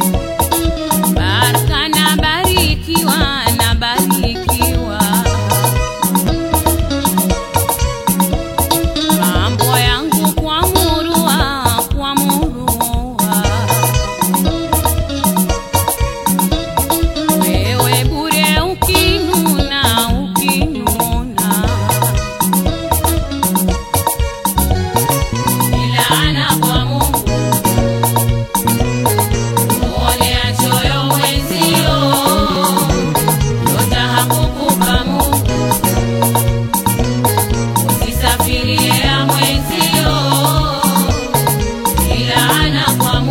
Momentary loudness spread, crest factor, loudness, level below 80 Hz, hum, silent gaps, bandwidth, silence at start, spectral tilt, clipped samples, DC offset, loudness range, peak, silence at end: 4 LU; 14 dB; -13 LUFS; -24 dBFS; none; none; 16.5 kHz; 0 s; -4 dB/octave; under 0.1%; under 0.1%; 2 LU; 0 dBFS; 0 s